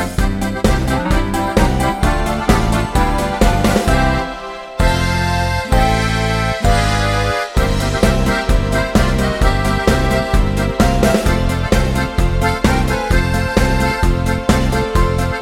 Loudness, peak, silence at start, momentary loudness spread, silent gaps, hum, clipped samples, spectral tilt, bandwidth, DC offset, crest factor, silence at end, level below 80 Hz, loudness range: -16 LUFS; 0 dBFS; 0 s; 3 LU; none; none; under 0.1%; -5.5 dB/octave; 16.5 kHz; under 0.1%; 14 dB; 0 s; -20 dBFS; 1 LU